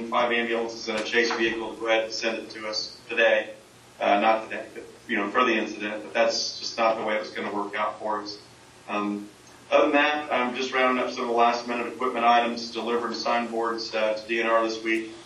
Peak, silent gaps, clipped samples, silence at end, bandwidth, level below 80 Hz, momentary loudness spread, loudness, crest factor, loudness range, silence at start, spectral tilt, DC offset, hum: -6 dBFS; none; under 0.1%; 0 s; 12 kHz; -68 dBFS; 10 LU; -25 LUFS; 20 dB; 4 LU; 0 s; -3 dB/octave; under 0.1%; none